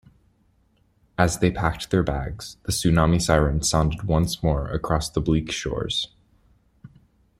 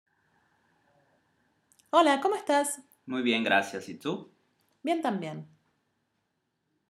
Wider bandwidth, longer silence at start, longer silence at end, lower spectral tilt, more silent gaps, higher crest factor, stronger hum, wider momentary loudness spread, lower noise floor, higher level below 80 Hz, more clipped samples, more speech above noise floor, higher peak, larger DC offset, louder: about the same, 15.5 kHz vs 15 kHz; second, 1.2 s vs 1.95 s; second, 0.5 s vs 1.45 s; first, -5 dB/octave vs -3.5 dB/octave; neither; about the same, 20 dB vs 22 dB; neither; second, 8 LU vs 15 LU; second, -63 dBFS vs -79 dBFS; first, -36 dBFS vs -86 dBFS; neither; second, 41 dB vs 51 dB; first, -4 dBFS vs -8 dBFS; neither; first, -23 LUFS vs -28 LUFS